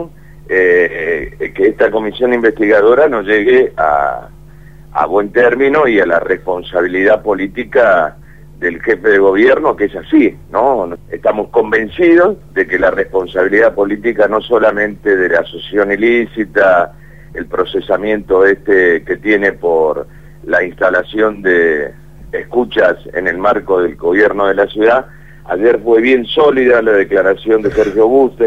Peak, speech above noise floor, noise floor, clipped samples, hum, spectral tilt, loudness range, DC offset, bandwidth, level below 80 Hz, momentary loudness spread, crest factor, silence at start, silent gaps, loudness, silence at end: 0 dBFS; 25 dB; -37 dBFS; under 0.1%; none; -6.5 dB/octave; 2 LU; 1%; 7 kHz; -40 dBFS; 8 LU; 12 dB; 0 s; none; -12 LUFS; 0 s